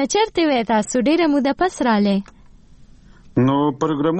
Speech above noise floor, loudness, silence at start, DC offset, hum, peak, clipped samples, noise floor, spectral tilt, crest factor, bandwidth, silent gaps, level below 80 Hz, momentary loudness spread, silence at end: 28 dB; -18 LUFS; 0 s; under 0.1%; none; -6 dBFS; under 0.1%; -45 dBFS; -5.5 dB/octave; 12 dB; 8.8 kHz; none; -48 dBFS; 3 LU; 0 s